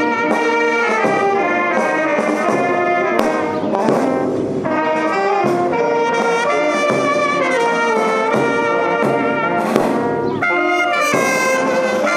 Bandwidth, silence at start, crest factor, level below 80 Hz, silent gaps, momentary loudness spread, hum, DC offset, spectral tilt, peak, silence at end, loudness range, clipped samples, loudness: 15 kHz; 0 s; 16 dB; -58 dBFS; none; 3 LU; none; under 0.1%; -4.5 dB/octave; 0 dBFS; 0 s; 1 LU; under 0.1%; -16 LUFS